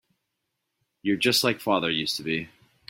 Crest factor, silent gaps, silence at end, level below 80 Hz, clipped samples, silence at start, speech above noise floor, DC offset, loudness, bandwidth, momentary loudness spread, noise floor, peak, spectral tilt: 22 dB; none; 0.45 s; -64 dBFS; under 0.1%; 1.05 s; 55 dB; under 0.1%; -25 LUFS; 16.5 kHz; 10 LU; -80 dBFS; -6 dBFS; -3.5 dB/octave